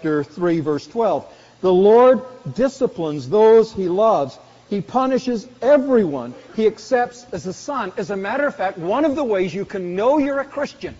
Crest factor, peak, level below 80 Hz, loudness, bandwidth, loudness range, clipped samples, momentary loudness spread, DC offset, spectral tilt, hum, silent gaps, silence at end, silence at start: 14 dB; -4 dBFS; -54 dBFS; -19 LUFS; 7.8 kHz; 6 LU; under 0.1%; 14 LU; under 0.1%; -5.5 dB/octave; none; none; 0.05 s; 0 s